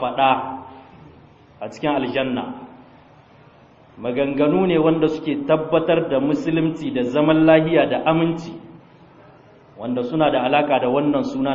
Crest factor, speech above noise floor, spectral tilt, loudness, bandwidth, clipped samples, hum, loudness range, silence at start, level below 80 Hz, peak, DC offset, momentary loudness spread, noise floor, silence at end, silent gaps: 20 dB; 30 dB; -7.5 dB/octave; -19 LUFS; 7.4 kHz; under 0.1%; none; 9 LU; 0 s; -54 dBFS; 0 dBFS; under 0.1%; 15 LU; -49 dBFS; 0 s; none